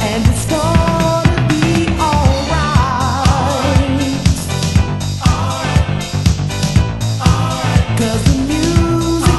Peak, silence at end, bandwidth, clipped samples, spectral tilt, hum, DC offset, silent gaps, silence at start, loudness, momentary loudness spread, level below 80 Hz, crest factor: 0 dBFS; 0 s; 12.5 kHz; under 0.1%; -5.5 dB/octave; none; under 0.1%; none; 0 s; -14 LUFS; 3 LU; -22 dBFS; 14 dB